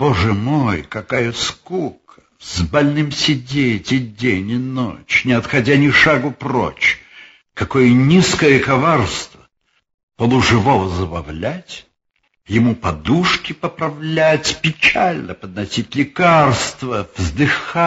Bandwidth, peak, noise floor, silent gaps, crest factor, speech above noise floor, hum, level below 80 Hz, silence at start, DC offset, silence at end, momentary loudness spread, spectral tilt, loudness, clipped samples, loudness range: 8 kHz; 0 dBFS; -67 dBFS; 9.94-10.08 s; 16 dB; 51 dB; none; -40 dBFS; 0 s; under 0.1%; 0 s; 13 LU; -5 dB/octave; -16 LUFS; under 0.1%; 5 LU